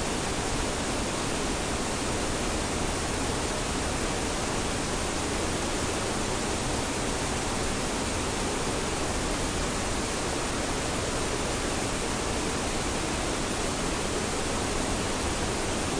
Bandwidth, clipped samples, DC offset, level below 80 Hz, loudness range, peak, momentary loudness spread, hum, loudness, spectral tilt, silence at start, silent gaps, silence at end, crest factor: 10.5 kHz; under 0.1%; under 0.1%; -38 dBFS; 0 LU; -16 dBFS; 0 LU; none; -29 LUFS; -3.5 dB/octave; 0 s; none; 0 s; 14 dB